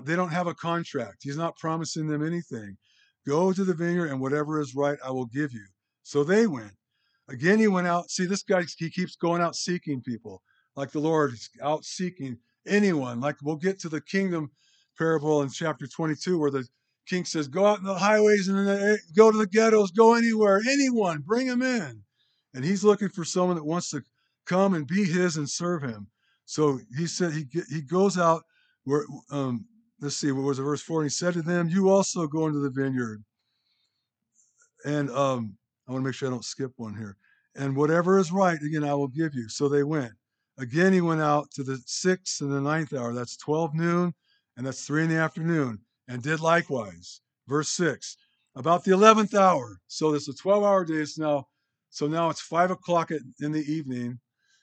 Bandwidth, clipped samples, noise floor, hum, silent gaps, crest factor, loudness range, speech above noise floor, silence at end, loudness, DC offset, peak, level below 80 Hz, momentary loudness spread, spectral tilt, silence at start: 9.2 kHz; under 0.1%; -80 dBFS; none; none; 26 dB; 7 LU; 55 dB; 0.45 s; -26 LUFS; under 0.1%; 0 dBFS; -78 dBFS; 14 LU; -5.5 dB/octave; 0 s